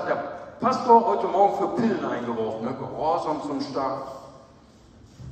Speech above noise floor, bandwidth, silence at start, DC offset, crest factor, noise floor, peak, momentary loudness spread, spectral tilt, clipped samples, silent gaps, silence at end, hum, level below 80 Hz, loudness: 28 dB; 8.8 kHz; 0 s; under 0.1%; 20 dB; -52 dBFS; -4 dBFS; 15 LU; -6.5 dB/octave; under 0.1%; none; 0 s; none; -60 dBFS; -24 LUFS